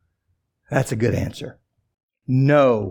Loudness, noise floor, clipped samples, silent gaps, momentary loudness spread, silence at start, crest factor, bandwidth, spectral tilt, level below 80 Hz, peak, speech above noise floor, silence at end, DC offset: -20 LUFS; -72 dBFS; under 0.1%; 2.03-2.09 s; 21 LU; 0.7 s; 18 dB; 17.5 kHz; -7 dB/octave; -54 dBFS; -2 dBFS; 53 dB; 0 s; under 0.1%